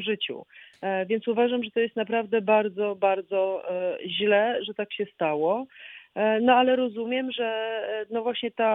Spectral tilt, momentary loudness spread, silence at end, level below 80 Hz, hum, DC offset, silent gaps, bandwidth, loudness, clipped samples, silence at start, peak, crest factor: -7.5 dB/octave; 9 LU; 0 s; -76 dBFS; none; under 0.1%; none; 4 kHz; -26 LUFS; under 0.1%; 0 s; -6 dBFS; 20 dB